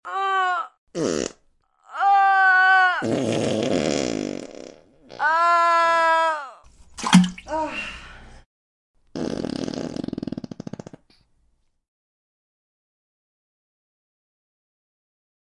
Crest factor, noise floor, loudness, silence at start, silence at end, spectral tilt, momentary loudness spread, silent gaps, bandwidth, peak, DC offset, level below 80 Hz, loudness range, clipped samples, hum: 22 dB; -65 dBFS; -21 LUFS; 0.05 s; 5.1 s; -4.5 dB/octave; 20 LU; 0.78-0.87 s, 8.46-8.94 s; 11.5 kHz; -2 dBFS; under 0.1%; -56 dBFS; 14 LU; under 0.1%; none